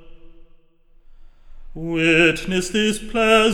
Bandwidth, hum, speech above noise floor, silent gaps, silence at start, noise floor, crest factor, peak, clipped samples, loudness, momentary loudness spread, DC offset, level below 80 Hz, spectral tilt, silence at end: 16.5 kHz; none; 34 dB; none; 0.05 s; -51 dBFS; 18 dB; -2 dBFS; under 0.1%; -18 LUFS; 10 LU; under 0.1%; -40 dBFS; -4 dB/octave; 0 s